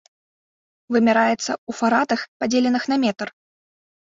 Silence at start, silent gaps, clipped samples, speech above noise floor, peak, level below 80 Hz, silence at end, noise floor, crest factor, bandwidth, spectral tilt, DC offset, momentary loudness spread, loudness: 0.9 s; 1.58-1.67 s, 2.28-2.40 s; under 0.1%; over 70 dB; -4 dBFS; -64 dBFS; 0.85 s; under -90 dBFS; 18 dB; 7.8 kHz; -4 dB/octave; under 0.1%; 8 LU; -20 LUFS